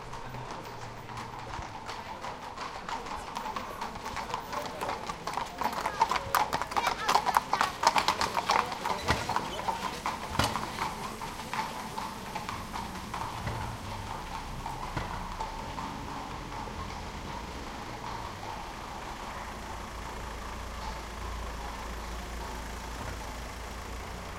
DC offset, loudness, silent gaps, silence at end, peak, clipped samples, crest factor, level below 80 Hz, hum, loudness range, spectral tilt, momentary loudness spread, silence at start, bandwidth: under 0.1%; -34 LUFS; none; 0 s; -4 dBFS; under 0.1%; 30 dB; -46 dBFS; none; 11 LU; -3.5 dB/octave; 12 LU; 0 s; 17 kHz